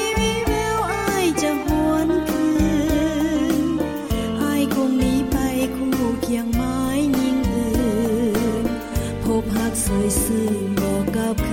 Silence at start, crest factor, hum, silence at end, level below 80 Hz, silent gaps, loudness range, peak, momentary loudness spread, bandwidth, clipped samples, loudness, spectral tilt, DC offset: 0 s; 12 dB; none; 0 s; -32 dBFS; none; 1 LU; -8 dBFS; 3 LU; 17 kHz; under 0.1%; -21 LUFS; -5 dB/octave; under 0.1%